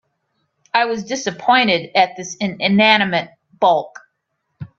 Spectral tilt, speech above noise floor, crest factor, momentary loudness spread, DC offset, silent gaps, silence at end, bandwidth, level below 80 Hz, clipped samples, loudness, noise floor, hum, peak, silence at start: -4 dB/octave; 56 dB; 18 dB; 12 LU; under 0.1%; none; 0.1 s; 7.6 kHz; -62 dBFS; under 0.1%; -16 LUFS; -72 dBFS; none; 0 dBFS; 0.75 s